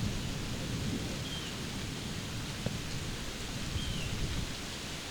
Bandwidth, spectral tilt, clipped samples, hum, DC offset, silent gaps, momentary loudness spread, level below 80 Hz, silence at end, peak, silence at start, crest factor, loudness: over 20 kHz; -4 dB/octave; under 0.1%; none; under 0.1%; none; 3 LU; -44 dBFS; 0 s; -18 dBFS; 0 s; 20 dB; -37 LUFS